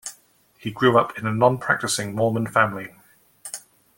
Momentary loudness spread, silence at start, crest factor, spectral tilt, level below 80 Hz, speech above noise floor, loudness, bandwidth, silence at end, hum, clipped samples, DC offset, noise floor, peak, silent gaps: 18 LU; 0.05 s; 20 dB; -4.5 dB/octave; -60 dBFS; 36 dB; -21 LUFS; 17 kHz; 0.4 s; none; under 0.1%; under 0.1%; -57 dBFS; -2 dBFS; none